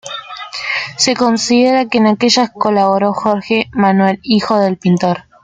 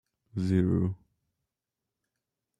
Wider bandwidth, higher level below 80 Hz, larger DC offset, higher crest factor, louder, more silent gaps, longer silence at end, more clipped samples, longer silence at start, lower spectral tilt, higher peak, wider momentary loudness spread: about the same, 9.4 kHz vs 9.4 kHz; first, -54 dBFS vs -62 dBFS; neither; second, 12 dB vs 20 dB; first, -13 LUFS vs -29 LUFS; neither; second, 0.25 s vs 1.65 s; neither; second, 0.05 s vs 0.35 s; second, -4.5 dB/octave vs -9.5 dB/octave; first, 0 dBFS vs -12 dBFS; second, 7 LU vs 15 LU